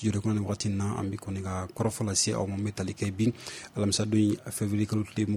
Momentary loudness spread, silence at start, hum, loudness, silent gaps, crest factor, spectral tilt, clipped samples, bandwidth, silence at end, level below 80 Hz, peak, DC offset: 8 LU; 0 s; none; -29 LUFS; none; 16 dB; -5 dB/octave; under 0.1%; 15.5 kHz; 0 s; -58 dBFS; -12 dBFS; under 0.1%